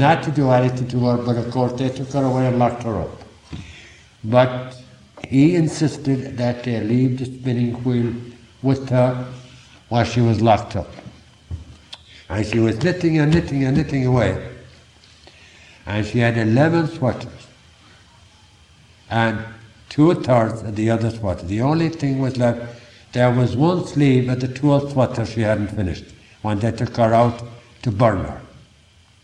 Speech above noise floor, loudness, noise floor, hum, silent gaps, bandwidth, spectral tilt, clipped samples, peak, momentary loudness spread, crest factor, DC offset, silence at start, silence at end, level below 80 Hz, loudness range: 34 dB; -19 LUFS; -52 dBFS; none; none; 10 kHz; -7.5 dB/octave; under 0.1%; -2 dBFS; 19 LU; 18 dB; under 0.1%; 0 s; 0.65 s; -46 dBFS; 3 LU